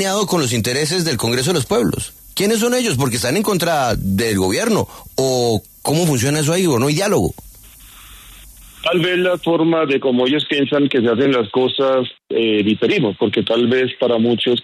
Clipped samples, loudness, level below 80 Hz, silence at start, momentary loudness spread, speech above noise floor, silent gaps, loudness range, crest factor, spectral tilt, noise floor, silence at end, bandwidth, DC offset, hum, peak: under 0.1%; -17 LUFS; -44 dBFS; 0 s; 4 LU; 25 dB; none; 3 LU; 12 dB; -4.5 dB/octave; -41 dBFS; 0 s; 13.5 kHz; under 0.1%; none; -4 dBFS